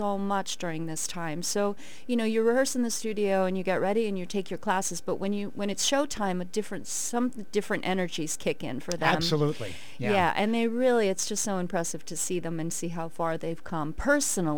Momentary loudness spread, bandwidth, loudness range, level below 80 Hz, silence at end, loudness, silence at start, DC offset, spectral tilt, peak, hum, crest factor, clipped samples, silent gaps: 8 LU; 19 kHz; 3 LU; -56 dBFS; 0 s; -29 LUFS; 0 s; 2%; -4 dB/octave; -10 dBFS; none; 20 dB; under 0.1%; none